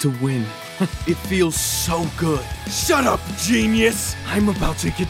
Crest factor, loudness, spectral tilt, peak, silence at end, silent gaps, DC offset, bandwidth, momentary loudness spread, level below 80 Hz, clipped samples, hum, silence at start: 16 dB; -20 LUFS; -4 dB/octave; -4 dBFS; 0 s; none; under 0.1%; 16.5 kHz; 8 LU; -34 dBFS; under 0.1%; none; 0 s